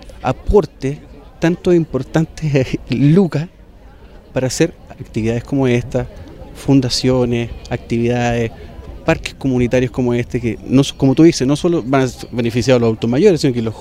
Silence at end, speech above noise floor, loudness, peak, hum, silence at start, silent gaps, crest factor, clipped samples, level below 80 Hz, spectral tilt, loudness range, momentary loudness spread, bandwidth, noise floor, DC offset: 0 s; 25 dB; -16 LUFS; 0 dBFS; none; 0 s; none; 16 dB; under 0.1%; -34 dBFS; -6.5 dB/octave; 4 LU; 12 LU; 15 kHz; -40 dBFS; under 0.1%